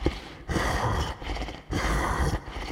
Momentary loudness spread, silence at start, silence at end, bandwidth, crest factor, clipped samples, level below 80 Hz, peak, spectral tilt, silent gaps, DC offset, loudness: 8 LU; 0 s; 0 s; 16 kHz; 20 dB; under 0.1%; -32 dBFS; -8 dBFS; -5 dB/octave; none; under 0.1%; -29 LUFS